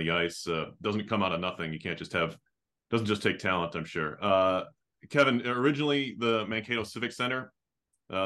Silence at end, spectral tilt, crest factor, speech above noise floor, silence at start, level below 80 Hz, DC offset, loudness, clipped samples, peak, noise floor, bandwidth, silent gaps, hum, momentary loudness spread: 0 s; -5.5 dB/octave; 20 dB; 53 dB; 0 s; -66 dBFS; under 0.1%; -30 LUFS; under 0.1%; -10 dBFS; -83 dBFS; 12.5 kHz; none; none; 9 LU